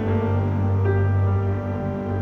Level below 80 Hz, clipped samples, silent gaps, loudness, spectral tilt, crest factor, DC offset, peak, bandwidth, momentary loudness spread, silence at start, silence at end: -44 dBFS; under 0.1%; none; -22 LUFS; -10.5 dB/octave; 12 dB; under 0.1%; -10 dBFS; 3.6 kHz; 6 LU; 0 s; 0 s